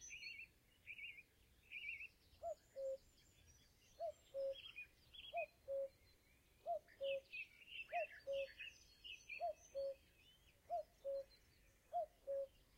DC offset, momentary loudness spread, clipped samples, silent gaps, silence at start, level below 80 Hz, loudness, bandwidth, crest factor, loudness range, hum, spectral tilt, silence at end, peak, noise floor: under 0.1%; 11 LU; under 0.1%; none; 0 s; -78 dBFS; -51 LUFS; 16 kHz; 16 dB; 4 LU; none; -1.5 dB/octave; 0 s; -34 dBFS; -74 dBFS